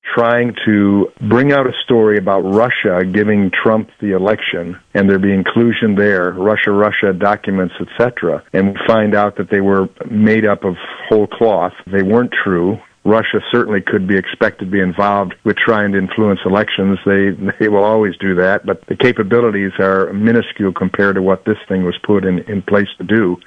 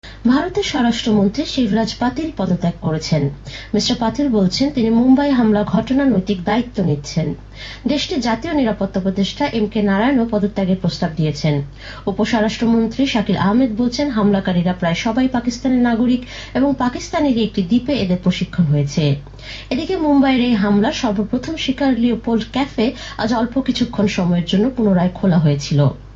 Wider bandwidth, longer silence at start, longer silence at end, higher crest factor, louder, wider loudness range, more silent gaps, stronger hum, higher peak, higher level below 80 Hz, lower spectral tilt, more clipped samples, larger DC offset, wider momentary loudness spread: second, 6 kHz vs 7.8 kHz; about the same, 0.05 s vs 0.05 s; about the same, 0.1 s vs 0 s; about the same, 12 dB vs 14 dB; first, -14 LUFS vs -17 LUFS; about the same, 2 LU vs 3 LU; neither; neither; first, 0 dBFS vs -4 dBFS; second, -52 dBFS vs -38 dBFS; first, -8.5 dB/octave vs -6.5 dB/octave; neither; neither; about the same, 5 LU vs 6 LU